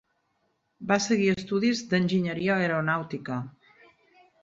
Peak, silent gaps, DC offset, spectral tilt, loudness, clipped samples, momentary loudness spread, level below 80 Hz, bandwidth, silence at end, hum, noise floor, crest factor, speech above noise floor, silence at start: -8 dBFS; none; under 0.1%; -5.5 dB/octave; -26 LUFS; under 0.1%; 10 LU; -64 dBFS; 7.8 kHz; 0.9 s; none; -74 dBFS; 20 dB; 48 dB; 0.8 s